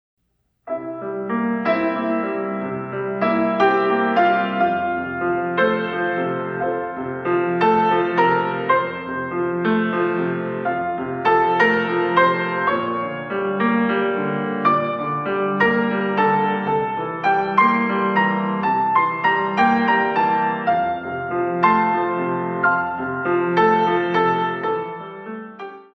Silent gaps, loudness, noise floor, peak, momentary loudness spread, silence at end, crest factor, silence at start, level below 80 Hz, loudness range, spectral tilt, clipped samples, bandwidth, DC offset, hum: none; -20 LUFS; -69 dBFS; -2 dBFS; 9 LU; 0.1 s; 18 dB; 0.65 s; -60 dBFS; 2 LU; -7.5 dB/octave; under 0.1%; 6.6 kHz; under 0.1%; none